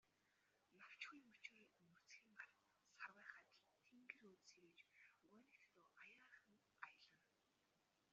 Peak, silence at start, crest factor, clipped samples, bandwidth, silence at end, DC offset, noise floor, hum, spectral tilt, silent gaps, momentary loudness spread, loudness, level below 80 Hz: -38 dBFS; 0.05 s; 30 dB; under 0.1%; 7.4 kHz; 0 s; under 0.1%; -86 dBFS; none; 0 dB/octave; none; 10 LU; -63 LUFS; under -90 dBFS